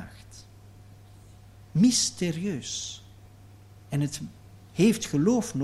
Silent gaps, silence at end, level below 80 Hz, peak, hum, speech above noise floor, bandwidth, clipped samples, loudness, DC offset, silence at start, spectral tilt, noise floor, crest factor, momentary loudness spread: none; 0 s; -58 dBFS; -10 dBFS; none; 25 dB; 14.5 kHz; under 0.1%; -26 LUFS; under 0.1%; 0 s; -4.5 dB/octave; -50 dBFS; 18 dB; 23 LU